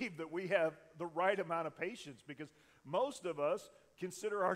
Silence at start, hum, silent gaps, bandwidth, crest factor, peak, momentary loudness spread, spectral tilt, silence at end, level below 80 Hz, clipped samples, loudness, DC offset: 0 s; none; none; 15.5 kHz; 20 dB; -18 dBFS; 15 LU; -5 dB/octave; 0 s; -82 dBFS; under 0.1%; -39 LUFS; under 0.1%